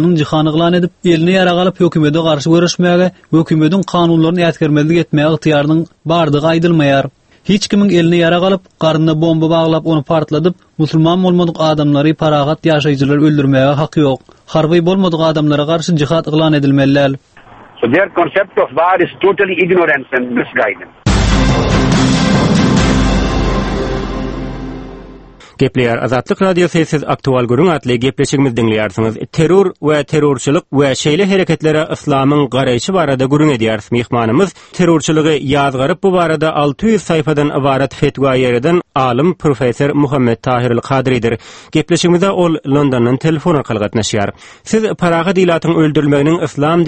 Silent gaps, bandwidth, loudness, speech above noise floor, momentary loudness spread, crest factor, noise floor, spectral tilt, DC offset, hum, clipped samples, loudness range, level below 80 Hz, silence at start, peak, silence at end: none; 8.8 kHz; -12 LUFS; 26 dB; 5 LU; 12 dB; -38 dBFS; -6 dB/octave; under 0.1%; none; under 0.1%; 2 LU; -30 dBFS; 0 s; 0 dBFS; 0 s